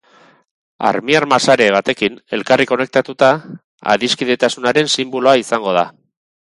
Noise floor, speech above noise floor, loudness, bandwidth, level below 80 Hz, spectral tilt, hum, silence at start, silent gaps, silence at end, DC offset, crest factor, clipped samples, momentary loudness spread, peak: -50 dBFS; 35 dB; -15 LUFS; 11.5 kHz; -60 dBFS; -3.5 dB/octave; none; 0.8 s; 3.64-3.78 s; 0.6 s; under 0.1%; 16 dB; under 0.1%; 7 LU; 0 dBFS